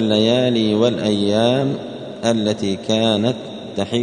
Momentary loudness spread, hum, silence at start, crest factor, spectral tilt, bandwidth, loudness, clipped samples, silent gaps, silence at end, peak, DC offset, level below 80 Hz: 11 LU; none; 0 s; 16 dB; -5.5 dB/octave; 10 kHz; -18 LUFS; under 0.1%; none; 0 s; -2 dBFS; under 0.1%; -56 dBFS